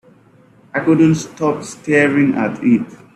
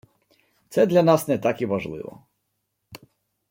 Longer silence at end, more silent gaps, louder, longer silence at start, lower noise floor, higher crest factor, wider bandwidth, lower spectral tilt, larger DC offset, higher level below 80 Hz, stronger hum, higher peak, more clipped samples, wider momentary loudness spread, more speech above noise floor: second, 0.2 s vs 0.55 s; neither; first, -16 LUFS vs -22 LUFS; about the same, 0.75 s vs 0.7 s; second, -49 dBFS vs -76 dBFS; about the same, 16 dB vs 20 dB; second, 11 kHz vs 16.5 kHz; about the same, -6.5 dB/octave vs -6.5 dB/octave; neither; first, -56 dBFS vs -64 dBFS; neither; about the same, -2 dBFS vs -4 dBFS; neither; second, 8 LU vs 17 LU; second, 34 dB vs 55 dB